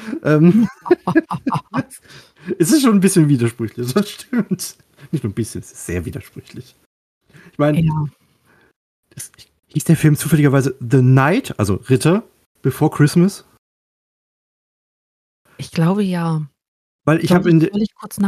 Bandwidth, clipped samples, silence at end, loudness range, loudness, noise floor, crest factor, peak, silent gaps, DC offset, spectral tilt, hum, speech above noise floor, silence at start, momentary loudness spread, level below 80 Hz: 15 kHz; under 0.1%; 0 s; 8 LU; -17 LUFS; -56 dBFS; 16 dB; -2 dBFS; 6.86-7.21 s, 8.76-9.03 s, 12.46-12.55 s, 13.58-15.45 s, 16.68-16.99 s; under 0.1%; -6.5 dB/octave; none; 39 dB; 0 s; 18 LU; -50 dBFS